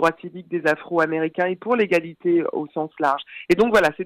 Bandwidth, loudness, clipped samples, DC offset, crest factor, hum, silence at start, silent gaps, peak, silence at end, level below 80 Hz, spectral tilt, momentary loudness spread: 15 kHz; -21 LUFS; under 0.1%; under 0.1%; 18 dB; none; 0 s; none; -4 dBFS; 0 s; -56 dBFS; -6 dB/octave; 10 LU